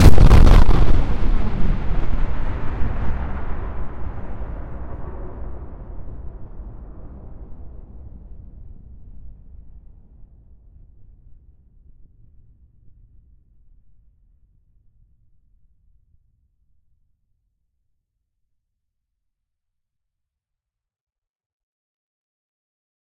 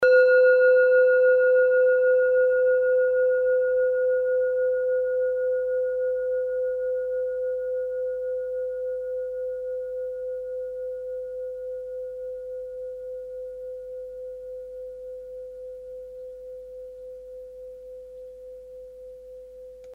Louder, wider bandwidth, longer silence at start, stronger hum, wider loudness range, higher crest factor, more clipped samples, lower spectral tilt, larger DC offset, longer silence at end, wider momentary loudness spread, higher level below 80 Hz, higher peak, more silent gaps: about the same, -22 LUFS vs -23 LUFS; first, 8.4 kHz vs 4.3 kHz; about the same, 0 s vs 0 s; neither; first, 25 LU vs 20 LU; about the same, 18 dB vs 16 dB; neither; first, -7 dB/octave vs -4 dB/octave; neither; first, 13.75 s vs 0 s; first, 28 LU vs 23 LU; first, -22 dBFS vs -62 dBFS; first, 0 dBFS vs -10 dBFS; neither